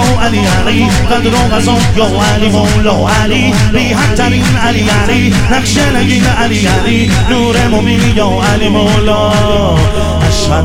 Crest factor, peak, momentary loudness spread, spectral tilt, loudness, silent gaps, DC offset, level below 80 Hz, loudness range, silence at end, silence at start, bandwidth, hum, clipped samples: 8 dB; 0 dBFS; 1 LU; -5 dB/octave; -9 LUFS; none; under 0.1%; -20 dBFS; 0 LU; 0 s; 0 s; 16.5 kHz; none; under 0.1%